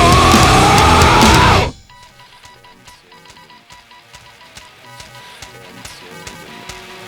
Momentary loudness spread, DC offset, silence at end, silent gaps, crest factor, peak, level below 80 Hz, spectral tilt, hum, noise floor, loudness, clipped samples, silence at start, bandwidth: 26 LU; under 0.1%; 0 s; none; 14 dB; 0 dBFS; -26 dBFS; -4 dB/octave; none; -42 dBFS; -9 LUFS; under 0.1%; 0 s; over 20 kHz